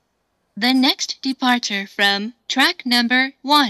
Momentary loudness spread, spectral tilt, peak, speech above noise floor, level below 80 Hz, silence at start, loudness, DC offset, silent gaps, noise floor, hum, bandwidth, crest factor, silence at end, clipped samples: 8 LU; -2 dB/octave; 0 dBFS; 51 dB; -74 dBFS; 0.55 s; -18 LUFS; under 0.1%; none; -69 dBFS; none; 15 kHz; 18 dB; 0 s; under 0.1%